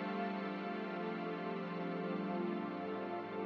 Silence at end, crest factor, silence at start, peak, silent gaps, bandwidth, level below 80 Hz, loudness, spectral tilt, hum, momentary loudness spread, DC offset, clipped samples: 0 s; 12 dB; 0 s; -28 dBFS; none; 6.4 kHz; -88 dBFS; -41 LUFS; -5.5 dB/octave; none; 2 LU; under 0.1%; under 0.1%